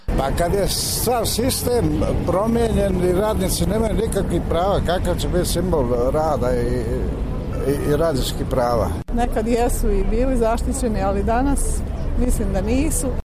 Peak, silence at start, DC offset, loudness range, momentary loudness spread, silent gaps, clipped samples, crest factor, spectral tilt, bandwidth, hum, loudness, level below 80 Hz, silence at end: -6 dBFS; 0 s; under 0.1%; 2 LU; 4 LU; none; under 0.1%; 12 dB; -5.5 dB/octave; 15.5 kHz; none; -20 LUFS; -24 dBFS; 0.05 s